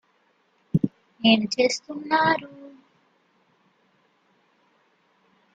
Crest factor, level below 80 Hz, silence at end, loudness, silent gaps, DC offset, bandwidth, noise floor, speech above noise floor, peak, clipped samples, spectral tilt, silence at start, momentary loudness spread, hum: 22 dB; -64 dBFS; 2.85 s; -23 LUFS; none; under 0.1%; 9 kHz; -66 dBFS; 44 dB; -4 dBFS; under 0.1%; -4.5 dB/octave; 0.75 s; 11 LU; none